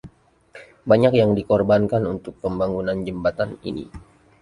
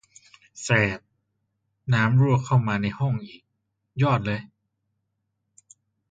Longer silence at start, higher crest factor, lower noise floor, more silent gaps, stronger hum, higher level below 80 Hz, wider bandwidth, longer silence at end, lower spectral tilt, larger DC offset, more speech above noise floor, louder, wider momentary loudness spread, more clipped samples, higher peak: second, 0.05 s vs 0.55 s; about the same, 18 dB vs 20 dB; second, -50 dBFS vs -78 dBFS; neither; neither; first, -46 dBFS vs -56 dBFS; first, 11 kHz vs 9 kHz; second, 0.4 s vs 1.65 s; first, -8.5 dB/octave vs -6.5 dB/octave; neither; second, 30 dB vs 56 dB; about the same, -21 LUFS vs -23 LUFS; about the same, 15 LU vs 17 LU; neither; first, -2 dBFS vs -6 dBFS